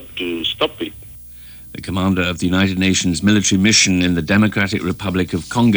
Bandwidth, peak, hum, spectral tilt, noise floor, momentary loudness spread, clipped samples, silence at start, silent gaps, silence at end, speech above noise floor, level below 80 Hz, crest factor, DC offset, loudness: over 20 kHz; -2 dBFS; 60 Hz at -45 dBFS; -4 dB/octave; -37 dBFS; 20 LU; under 0.1%; 0 s; none; 0 s; 21 dB; -42 dBFS; 14 dB; under 0.1%; -16 LUFS